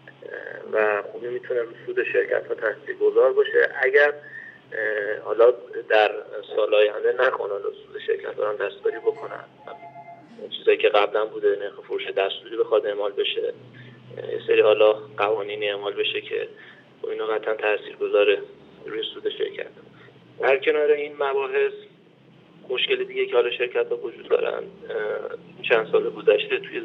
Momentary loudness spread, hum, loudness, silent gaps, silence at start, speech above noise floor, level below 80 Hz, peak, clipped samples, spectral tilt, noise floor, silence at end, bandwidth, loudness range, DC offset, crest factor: 17 LU; none; -23 LUFS; none; 0.05 s; 30 dB; -78 dBFS; -4 dBFS; under 0.1%; -5.5 dB/octave; -53 dBFS; 0 s; 5.2 kHz; 4 LU; under 0.1%; 18 dB